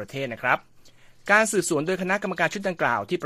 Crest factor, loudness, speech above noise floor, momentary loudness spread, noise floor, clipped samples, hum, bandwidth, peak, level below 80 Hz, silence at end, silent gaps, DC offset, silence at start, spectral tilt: 22 dB; -24 LUFS; 26 dB; 8 LU; -50 dBFS; under 0.1%; none; 15 kHz; -4 dBFS; -62 dBFS; 0 s; none; under 0.1%; 0 s; -4 dB/octave